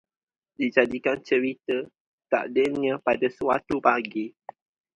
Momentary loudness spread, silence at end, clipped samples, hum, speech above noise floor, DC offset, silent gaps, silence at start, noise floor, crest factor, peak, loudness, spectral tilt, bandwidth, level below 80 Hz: 8 LU; 0.65 s; under 0.1%; none; 62 dB; under 0.1%; 2.00-2.18 s; 0.6 s; -86 dBFS; 22 dB; -4 dBFS; -25 LUFS; -6 dB/octave; 9.2 kHz; -64 dBFS